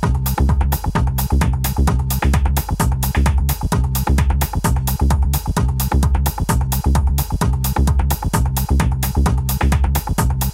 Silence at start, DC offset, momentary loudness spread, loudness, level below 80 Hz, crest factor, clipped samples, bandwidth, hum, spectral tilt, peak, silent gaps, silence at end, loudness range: 0 s; under 0.1%; 2 LU; -18 LUFS; -18 dBFS; 14 dB; under 0.1%; 16.5 kHz; none; -5.5 dB/octave; -2 dBFS; none; 0 s; 0 LU